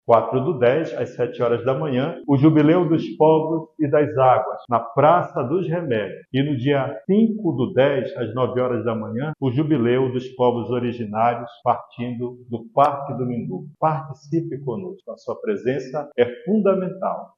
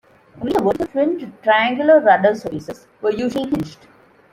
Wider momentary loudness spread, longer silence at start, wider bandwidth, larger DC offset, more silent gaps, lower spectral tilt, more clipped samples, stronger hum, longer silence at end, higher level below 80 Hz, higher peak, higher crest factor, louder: second, 11 LU vs 16 LU; second, 0.1 s vs 0.35 s; second, 7 kHz vs 15 kHz; neither; neither; first, -9 dB/octave vs -6 dB/octave; neither; neither; second, 0.1 s vs 0.6 s; second, -62 dBFS vs -52 dBFS; about the same, -2 dBFS vs -2 dBFS; about the same, 18 dB vs 16 dB; second, -21 LUFS vs -18 LUFS